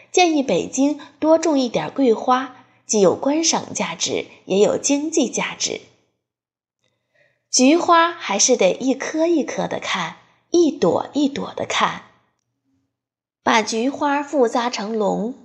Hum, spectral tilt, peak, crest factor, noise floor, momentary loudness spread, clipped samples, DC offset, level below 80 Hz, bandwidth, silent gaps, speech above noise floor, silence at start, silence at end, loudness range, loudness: none; -3 dB/octave; -2 dBFS; 18 dB; under -90 dBFS; 9 LU; under 0.1%; under 0.1%; -66 dBFS; 10 kHz; none; over 71 dB; 0.15 s; 0.1 s; 5 LU; -19 LUFS